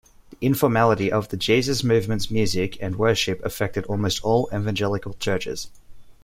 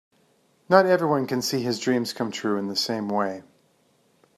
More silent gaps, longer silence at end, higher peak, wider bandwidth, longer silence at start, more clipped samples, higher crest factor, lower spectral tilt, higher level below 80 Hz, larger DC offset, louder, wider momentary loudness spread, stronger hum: neither; second, 0.1 s vs 0.95 s; about the same, -4 dBFS vs -2 dBFS; first, 16.5 kHz vs 14.5 kHz; second, 0.4 s vs 0.7 s; neither; about the same, 18 dB vs 22 dB; about the same, -5 dB/octave vs -4.5 dB/octave; first, -44 dBFS vs -72 dBFS; neither; about the same, -23 LUFS vs -24 LUFS; about the same, 8 LU vs 9 LU; neither